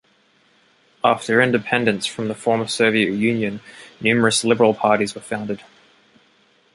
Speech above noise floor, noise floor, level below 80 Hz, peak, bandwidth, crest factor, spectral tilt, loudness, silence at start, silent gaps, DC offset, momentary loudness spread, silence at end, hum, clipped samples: 40 dB; -59 dBFS; -60 dBFS; -2 dBFS; 11.5 kHz; 20 dB; -4 dB/octave; -19 LUFS; 1.05 s; none; under 0.1%; 11 LU; 1.15 s; none; under 0.1%